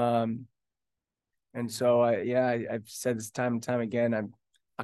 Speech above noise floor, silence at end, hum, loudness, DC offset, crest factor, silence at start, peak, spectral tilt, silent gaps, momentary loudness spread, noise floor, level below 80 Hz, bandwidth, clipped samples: 60 dB; 0 s; none; -29 LUFS; under 0.1%; 16 dB; 0 s; -14 dBFS; -6 dB/octave; none; 14 LU; -89 dBFS; -76 dBFS; 12.5 kHz; under 0.1%